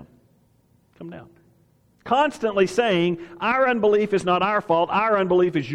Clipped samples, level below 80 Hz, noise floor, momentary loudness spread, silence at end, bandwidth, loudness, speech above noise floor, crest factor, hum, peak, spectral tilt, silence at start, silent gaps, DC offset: under 0.1%; -60 dBFS; -61 dBFS; 9 LU; 0 s; 11 kHz; -21 LUFS; 40 dB; 16 dB; none; -6 dBFS; -6 dB/octave; 0 s; none; under 0.1%